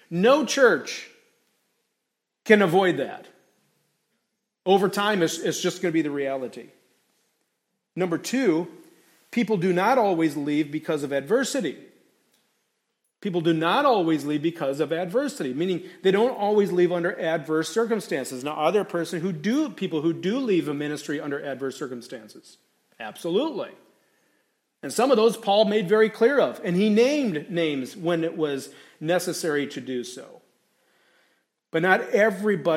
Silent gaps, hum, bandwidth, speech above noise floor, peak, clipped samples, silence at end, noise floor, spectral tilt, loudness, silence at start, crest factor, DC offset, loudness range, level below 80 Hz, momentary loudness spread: none; none; 16 kHz; 58 dB; -2 dBFS; under 0.1%; 0 s; -81 dBFS; -5 dB/octave; -24 LUFS; 0.1 s; 22 dB; under 0.1%; 7 LU; -78 dBFS; 14 LU